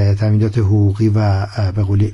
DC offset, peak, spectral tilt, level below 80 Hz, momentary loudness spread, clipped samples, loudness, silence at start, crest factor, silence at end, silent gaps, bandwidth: under 0.1%; -4 dBFS; -9 dB/octave; -42 dBFS; 4 LU; under 0.1%; -15 LUFS; 0 s; 10 dB; 0 s; none; 6.4 kHz